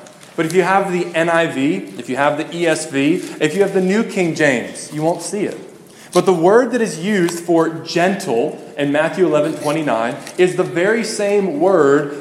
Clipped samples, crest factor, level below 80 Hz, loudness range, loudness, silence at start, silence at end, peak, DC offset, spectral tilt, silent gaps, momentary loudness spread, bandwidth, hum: under 0.1%; 16 dB; -66 dBFS; 1 LU; -17 LUFS; 0 s; 0 s; 0 dBFS; under 0.1%; -5 dB/octave; none; 8 LU; 15 kHz; none